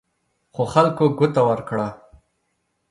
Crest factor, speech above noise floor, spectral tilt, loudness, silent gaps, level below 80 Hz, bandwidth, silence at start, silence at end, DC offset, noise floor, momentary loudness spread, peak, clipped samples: 20 dB; 53 dB; -7.5 dB/octave; -20 LUFS; none; -56 dBFS; 11.5 kHz; 0.55 s; 0.95 s; under 0.1%; -72 dBFS; 11 LU; -2 dBFS; under 0.1%